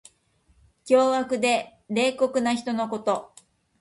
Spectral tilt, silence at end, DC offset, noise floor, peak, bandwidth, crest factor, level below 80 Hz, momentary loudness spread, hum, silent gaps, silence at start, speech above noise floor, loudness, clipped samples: -4 dB/octave; 0.55 s; under 0.1%; -64 dBFS; -8 dBFS; 11.5 kHz; 18 dB; -66 dBFS; 8 LU; none; none; 0.85 s; 41 dB; -24 LUFS; under 0.1%